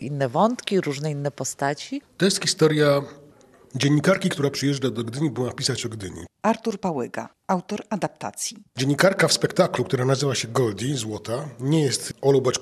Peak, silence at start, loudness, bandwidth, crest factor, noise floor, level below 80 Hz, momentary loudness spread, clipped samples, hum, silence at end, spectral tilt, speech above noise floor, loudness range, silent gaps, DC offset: -2 dBFS; 0 s; -23 LUFS; 14.5 kHz; 20 dB; -52 dBFS; -62 dBFS; 10 LU; under 0.1%; none; 0 s; -4.5 dB/octave; 29 dB; 5 LU; none; under 0.1%